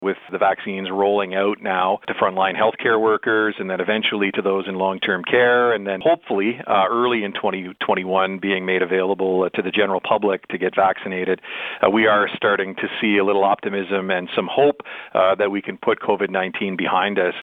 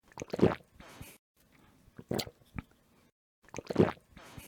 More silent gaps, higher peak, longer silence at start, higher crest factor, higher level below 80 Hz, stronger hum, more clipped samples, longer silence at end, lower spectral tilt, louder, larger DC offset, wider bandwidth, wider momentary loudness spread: second, none vs 1.19-1.35 s, 3.12-3.42 s; first, -2 dBFS vs -10 dBFS; second, 0 s vs 0.15 s; second, 18 dB vs 26 dB; second, -68 dBFS vs -58 dBFS; neither; neither; about the same, 0 s vs 0 s; about the same, -7.5 dB/octave vs -6.5 dB/octave; first, -20 LUFS vs -33 LUFS; neither; second, 4.5 kHz vs 19.5 kHz; second, 6 LU vs 22 LU